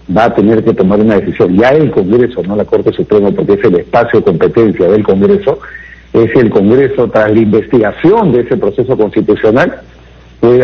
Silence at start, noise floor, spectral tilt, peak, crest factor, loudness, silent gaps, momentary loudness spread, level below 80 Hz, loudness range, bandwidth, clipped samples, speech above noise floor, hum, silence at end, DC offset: 0.1 s; -36 dBFS; -9 dB/octave; 0 dBFS; 8 dB; -9 LUFS; none; 5 LU; -38 dBFS; 1 LU; 6.6 kHz; 0.2%; 28 dB; none; 0 s; under 0.1%